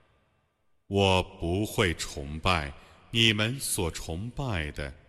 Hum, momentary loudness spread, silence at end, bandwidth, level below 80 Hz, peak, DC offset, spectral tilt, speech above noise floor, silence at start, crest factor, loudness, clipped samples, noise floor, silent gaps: none; 12 LU; 0.15 s; 14.5 kHz; -44 dBFS; -8 dBFS; under 0.1%; -4 dB/octave; 43 dB; 0.9 s; 22 dB; -28 LUFS; under 0.1%; -71 dBFS; none